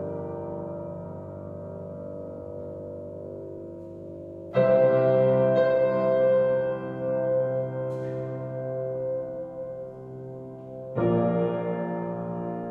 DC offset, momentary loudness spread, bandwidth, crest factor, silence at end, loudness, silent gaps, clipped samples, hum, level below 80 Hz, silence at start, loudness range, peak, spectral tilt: under 0.1%; 18 LU; 4.7 kHz; 16 dB; 0 s; -26 LUFS; none; under 0.1%; none; -62 dBFS; 0 s; 15 LU; -10 dBFS; -10 dB/octave